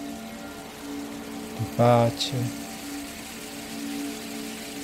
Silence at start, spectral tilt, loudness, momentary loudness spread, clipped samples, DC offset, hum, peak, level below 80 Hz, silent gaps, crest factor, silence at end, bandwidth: 0 s; -5 dB/octave; -29 LUFS; 16 LU; under 0.1%; under 0.1%; none; -8 dBFS; -56 dBFS; none; 22 dB; 0 s; 16 kHz